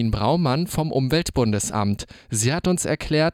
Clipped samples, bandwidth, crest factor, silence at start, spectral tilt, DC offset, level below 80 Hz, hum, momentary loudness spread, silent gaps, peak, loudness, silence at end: under 0.1%; 17 kHz; 12 dB; 0 s; -5 dB/octave; under 0.1%; -40 dBFS; none; 4 LU; none; -8 dBFS; -22 LUFS; 0 s